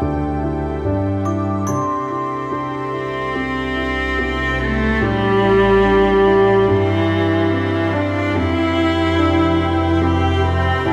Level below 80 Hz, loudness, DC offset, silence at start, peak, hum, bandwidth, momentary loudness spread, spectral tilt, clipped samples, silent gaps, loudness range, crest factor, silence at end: -32 dBFS; -17 LUFS; under 0.1%; 0 s; -4 dBFS; none; 8.6 kHz; 9 LU; -7 dB/octave; under 0.1%; none; 6 LU; 14 dB; 0 s